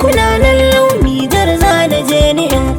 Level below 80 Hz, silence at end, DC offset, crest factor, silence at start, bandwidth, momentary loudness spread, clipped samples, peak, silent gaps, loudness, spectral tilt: -20 dBFS; 0 s; under 0.1%; 10 dB; 0 s; 20 kHz; 3 LU; under 0.1%; 0 dBFS; none; -10 LUFS; -5 dB/octave